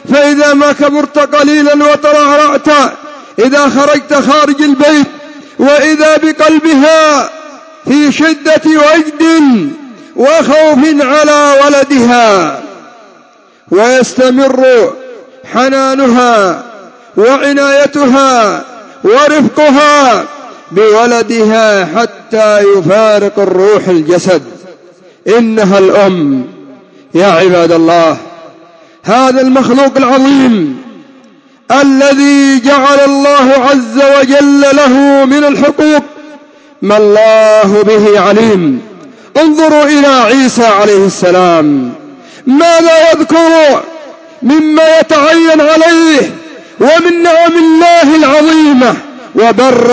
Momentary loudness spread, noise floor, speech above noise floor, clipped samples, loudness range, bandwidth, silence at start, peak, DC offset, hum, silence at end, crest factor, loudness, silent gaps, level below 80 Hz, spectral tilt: 8 LU; -41 dBFS; 36 dB; 2%; 3 LU; 8 kHz; 0.05 s; 0 dBFS; under 0.1%; none; 0 s; 6 dB; -6 LUFS; none; -54 dBFS; -4.5 dB/octave